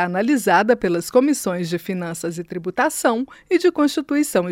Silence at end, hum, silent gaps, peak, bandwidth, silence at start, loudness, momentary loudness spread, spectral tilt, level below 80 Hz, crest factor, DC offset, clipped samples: 0 s; none; none; -4 dBFS; 16.5 kHz; 0 s; -20 LUFS; 10 LU; -5 dB/octave; -58 dBFS; 16 dB; under 0.1%; under 0.1%